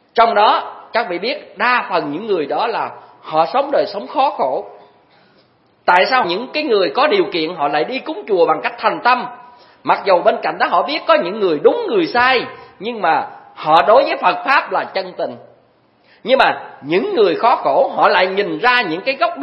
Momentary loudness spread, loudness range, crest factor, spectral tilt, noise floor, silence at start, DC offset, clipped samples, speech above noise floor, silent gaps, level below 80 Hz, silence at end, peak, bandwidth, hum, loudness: 10 LU; 3 LU; 16 dB; -6 dB/octave; -54 dBFS; 0.15 s; under 0.1%; under 0.1%; 39 dB; none; -62 dBFS; 0 s; 0 dBFS; 6 kHz; none; -16 LUFS